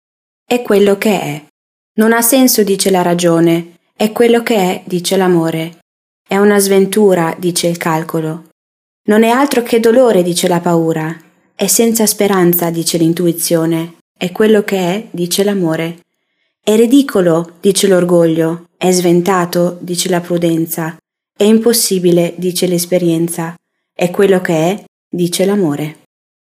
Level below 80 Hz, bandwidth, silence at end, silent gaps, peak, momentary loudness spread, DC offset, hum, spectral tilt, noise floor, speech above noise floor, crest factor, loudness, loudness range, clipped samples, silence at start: -60 dBFS; 16 kHz; 0.5 s; 1.50-1.95 s, 5.82-6.25 s, 8.52-9.05 s, 14.01-14.15 s, 24.88-25.11 s; 0 dBFS; 10 LU; under 0.1%; none; -4.5 dB/octave; -66 dBFS; 54 dB; 12 dB; -12 LUFS; 3 LU; under 0.1%; 0.5 s